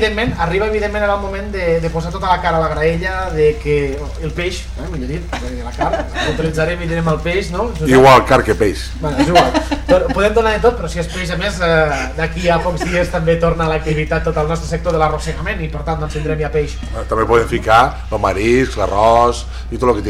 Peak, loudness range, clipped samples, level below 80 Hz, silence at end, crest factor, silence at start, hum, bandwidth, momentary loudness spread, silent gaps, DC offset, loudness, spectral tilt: -2 dBFS; 7 LU; under 0.1%; -26 dBFS; 0 s; 14 dB; 0 s; none; 15.5 kHz; 10 LU; none; under 0.1%; -16 LUFS; -5.5 dB/octave